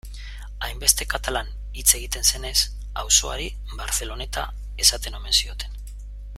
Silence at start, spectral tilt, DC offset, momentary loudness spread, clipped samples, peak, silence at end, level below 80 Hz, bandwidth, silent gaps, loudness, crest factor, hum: 0.05 s; -0.5 dB/octave; under 0.1%; 17 LU; under 0.1%; 0 dBFS; 0 s; -32 dBFS; 16 kHz; none; -21 LUFS; 24 dB; 50 Hz at -30 dBFS